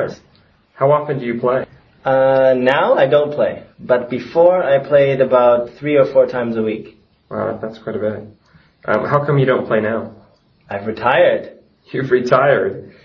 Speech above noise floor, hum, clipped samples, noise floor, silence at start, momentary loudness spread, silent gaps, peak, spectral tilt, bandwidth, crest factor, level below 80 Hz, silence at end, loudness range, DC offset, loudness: 38 dB; none; under 0.1%; -53 dBFS; 0 s; 13 LU; none; 0 dBFS; -8 dB/octave; 6.4 kHz; 16 dB; -56 dBFS; 0.15 s; 5 LU; under 0.1%; -16 LUFS